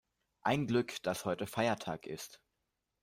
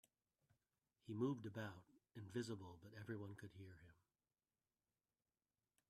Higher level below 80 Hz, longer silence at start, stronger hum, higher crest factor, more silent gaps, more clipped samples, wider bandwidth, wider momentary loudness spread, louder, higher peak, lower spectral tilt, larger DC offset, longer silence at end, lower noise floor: first, -70 dBFS vs -86 dBFS; second, 0.45 s vs 1.05 s; neither; about the same, 20 dB vs 22 dB; neither; neither; first, 16 kHz vs 13.5 kHz; second, 13 LU vs 19 LU; first, -36 LUFS vs -51 LUFS; first, -18 dBFS vs -32 dBFS; second, -5 dB/octave vs -6.5 dB/octave; neither; second, 0.65 s vs 1.95 s; second, -85 dBFS vs under -90 dBFS